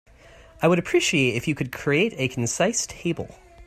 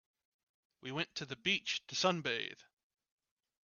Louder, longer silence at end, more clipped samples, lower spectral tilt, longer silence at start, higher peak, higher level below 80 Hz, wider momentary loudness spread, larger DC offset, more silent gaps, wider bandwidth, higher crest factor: first, -23 LUFS vs -36 LUFS; second, 0.05 s vs 1 s; neither; about the same, -4 dB/octave vs -3 dB/octave; second, 0.6 s vs 0.85 s; first, -6 dBFS vs -16 dBFS; first, -52 dBFS vs -80 dBFS; second, 9 LU vs 12 LU; neither; neither; first, 15.5 kHz vs 7.4 kHz; second, 18 dB vs 24 dB